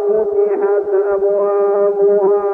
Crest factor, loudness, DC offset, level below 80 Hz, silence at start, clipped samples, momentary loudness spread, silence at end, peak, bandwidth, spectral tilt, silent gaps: 10 dB; -14 LUFS; under 0.1%; -58 dBFS; 0 s; under 0.1%; 3 LU; 0 s; -4 dBFS; 2.6 kHz; -10 dB/octave; none